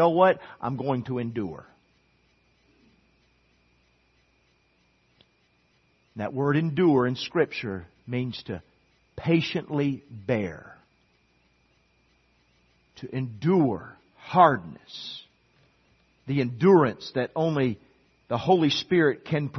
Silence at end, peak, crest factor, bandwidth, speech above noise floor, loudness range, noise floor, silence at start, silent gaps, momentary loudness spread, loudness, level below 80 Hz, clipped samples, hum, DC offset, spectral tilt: 0 s; -4 dBFS; 22 dB; 6.4 kHz; 42 dB; 12 LU; -67 dBFS; 0 s; none; 19 LU; -25 LUFS; -64 dBFS; under 0.1%; none; under 0.1%; -7.5 dB/octave